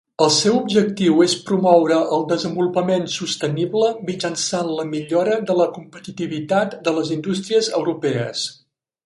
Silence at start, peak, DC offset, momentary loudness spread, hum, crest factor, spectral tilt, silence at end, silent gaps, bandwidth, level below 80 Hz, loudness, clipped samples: 0.2 s; 0 dBFS; under 0.1%; 9 LU; none; 18 dB; -4.5 dB/octave; 0.55 s; none; 11.5 kHz; -64 dBFS; -19 LUFS; under 0.1%